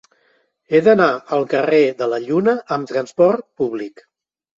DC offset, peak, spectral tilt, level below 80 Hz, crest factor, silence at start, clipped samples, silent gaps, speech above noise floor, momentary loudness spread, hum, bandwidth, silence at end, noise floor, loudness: under 0.1%; -2 dBFS; -6.5 dB/octave; -64 dBFS; 16 dB; 0.7 s; under 0.1%; none; 45 dB; 10 LU; none; 7.6 kHz; 0.7 s; -62 dBFS; -17 LUFS